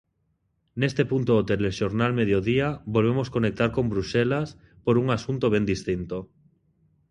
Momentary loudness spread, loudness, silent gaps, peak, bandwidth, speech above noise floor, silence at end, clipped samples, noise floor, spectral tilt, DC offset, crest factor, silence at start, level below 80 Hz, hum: 7 LU; -25 LUFS; none; -8 dBFS; 10.5 kHz; 48 dB; 0.85 s; under 0.1%; -72 dBFS; -7 dB/octave; under 0.1%; 18 dB; 0.75 s; -48 dBFS; none